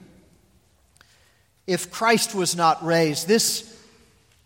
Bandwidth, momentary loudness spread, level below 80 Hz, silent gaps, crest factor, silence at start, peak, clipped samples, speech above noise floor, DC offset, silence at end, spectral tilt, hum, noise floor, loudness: 16.5 kHz; 8 LU; -66 dBFS; none; 20 dB; 1.7 s; -4 dBFS; under 0.1%; 39 dB; under 0.1%; 0.8 s; -3 dB/octave; none; -61 dBFS; -21 LUFS